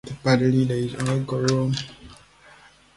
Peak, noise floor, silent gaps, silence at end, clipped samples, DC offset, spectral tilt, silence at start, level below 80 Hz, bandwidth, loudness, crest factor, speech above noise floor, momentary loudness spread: -6 dBFS; -51 dBFS; none; 0.85 s; under 0.1%; under 0.1%; -6.5 dB/octave; 0.05 s; -52 dBFS; 11.5 kHz; -23 LUFS; 18 dB; 30 dB; 8 LU